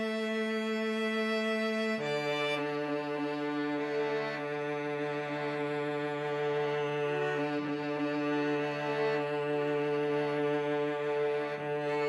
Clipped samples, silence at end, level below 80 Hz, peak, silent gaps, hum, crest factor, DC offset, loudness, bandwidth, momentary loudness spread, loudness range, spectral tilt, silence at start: under 0.1%; 0 s; -82 dBFS; -20 dBFS; none; none; 12 dB; under 0.1%; -32 LUFS; 12 kHz; 3 LU; 2 LU; -6 dB/octave; 0 s